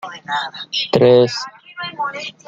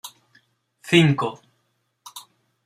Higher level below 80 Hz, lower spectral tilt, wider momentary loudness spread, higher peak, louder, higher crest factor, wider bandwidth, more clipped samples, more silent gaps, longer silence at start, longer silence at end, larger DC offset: about the same, -60 dBFS vs -62 dBFS; about the same, -5 dB/octave vs -5.5 dB/octave; second, 17 LU vs 25 LU; about the same, -2 dBFS vs -2 dBFS; about the same, -17 LUFS vs -19 LUFS; second, 16 dB vs 22 dB; second, 7.6 kHz vs 15.5 kHz; neither; neither; about the same, 0.05 s vs 0.05 s; second, 0.15 s vs 0.45 s; neither